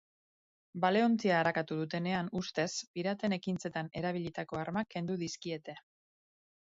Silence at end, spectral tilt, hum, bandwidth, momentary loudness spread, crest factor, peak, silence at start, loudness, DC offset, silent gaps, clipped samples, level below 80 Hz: 0.95 s; -4.5 dB/octave; none; 7.6 kHz; 11 LU; 18 dB; -16 dBFS; 0.75 s; -34 LUFS; under 0.1%; 2.87-2.94 s; under 0.1%; -72 dBFS